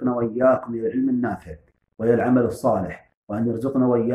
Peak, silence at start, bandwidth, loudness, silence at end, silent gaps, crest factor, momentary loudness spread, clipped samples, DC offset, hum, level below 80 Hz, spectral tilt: -6 dBFS; 0 s; 12.5 kHz; -22 LUFS; 0 s; 3.17-3.27 s; 16 dB; 13 LU; under 0.1%; under 0.1%; none; -54 dBFS; -9 dB/octave